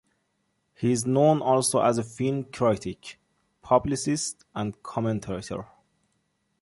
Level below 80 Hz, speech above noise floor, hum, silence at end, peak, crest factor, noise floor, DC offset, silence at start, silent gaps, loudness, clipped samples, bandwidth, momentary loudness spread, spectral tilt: -56 dBFS; 49 dB; none; 0.95 s; -6 dBFS; 20 dB; -74 dBFS; under 0.1%; 0.8 s; none; -25 LUFS; under 0.1%; 12 kHz; 13 LU; -5.5 dB/octave